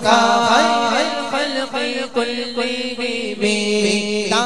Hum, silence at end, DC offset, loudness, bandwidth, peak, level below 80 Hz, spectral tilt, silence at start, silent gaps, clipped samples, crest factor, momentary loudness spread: none; 0 s; 1%; -18 LUFS; 13 kHz; 0 dBFS; -58 dBFS; -3 dB/octave; 0 s; none; under 0.1%; 18 dB; 8 LU